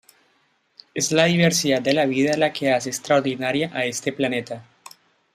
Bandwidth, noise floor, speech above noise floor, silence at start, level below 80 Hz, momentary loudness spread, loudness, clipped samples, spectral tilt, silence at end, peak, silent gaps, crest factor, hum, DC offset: 15.5 kHz; -65 dBFS; 44 dB; 0.95 s; -64 dBFS; 8 LU; -21 LUFS; under 0.1%; -4 dB/octave; 0.7 s; -2 dBFS; none; 20 dB; none; under 0.1%